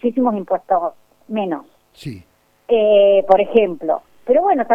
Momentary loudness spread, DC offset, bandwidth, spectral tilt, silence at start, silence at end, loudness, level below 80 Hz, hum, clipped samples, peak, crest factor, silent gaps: 18 LU; under 0.1%; 7.6 kHz; -7.5 dB/octave; 0.05 s; 0 s; -17 LUFS; -56 dBFS; none; under 0.1%; 0 dBFS; 16 dB; none